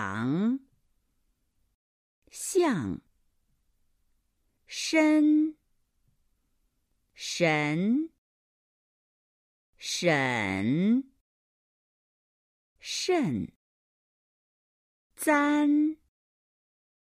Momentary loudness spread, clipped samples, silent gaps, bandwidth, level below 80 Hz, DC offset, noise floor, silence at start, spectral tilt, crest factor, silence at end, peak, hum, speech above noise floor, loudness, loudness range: 16 LU; under 0.1%; 1.75-2.22 s, 8.18-9.73 s, 11.21-12.76 s, 13.56-15.10 s; 15 kHz; -70 dBFS; under 0.1%; -74 dBFS; 0 s; -5 dB/octave; 20 dB; 1.05 s; -10 dBFS; none; 49 dB; -27 LUFS; 6 LU